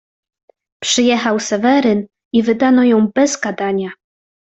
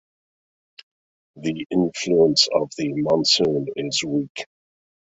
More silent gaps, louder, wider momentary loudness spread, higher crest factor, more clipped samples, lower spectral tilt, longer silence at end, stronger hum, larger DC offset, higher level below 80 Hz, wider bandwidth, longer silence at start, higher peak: about the same, 2.25-2.31 s vs 4.30-4.35 s; first, -15 LUFS vs -20 LUFS; second, 8 LU vs 13 LU; second, 14 dB vs 20 dB; neither; about the same, -4 dB/octave vs -4 dB/octave; about the same, 0.65 s vs 0.65 s; neither; neither; about the same, -58 dBFS vs -60 dBFS; about the same, 8.2 kHz vs 8.2 kHz; second, 0.8 s vs 1.35 s; about the same, -2 dBFS vs -2 dBFS